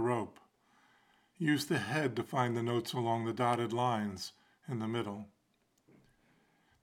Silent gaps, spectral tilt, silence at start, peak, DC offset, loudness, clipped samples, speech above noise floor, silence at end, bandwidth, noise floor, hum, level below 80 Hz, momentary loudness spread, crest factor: none; -5.5 dB/octave; 0 s; -16 dBFS; under 0.1%; -35 LUFS; under 0.1%; 42 dB; 1.55 s; 17 kHz; -76 dBFS; none; -78 dBFS; 13 LU; 20 dB